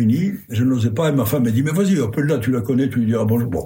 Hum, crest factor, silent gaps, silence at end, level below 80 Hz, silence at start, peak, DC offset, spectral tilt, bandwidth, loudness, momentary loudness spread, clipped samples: none; 12 dB; none; 0 s; -52 dBFS; 0 s; -6 dBFS; under 0.1%; -7.5 dB/octave; 16.5 kHz; -19 LUFS; 2 LU; under 0.1%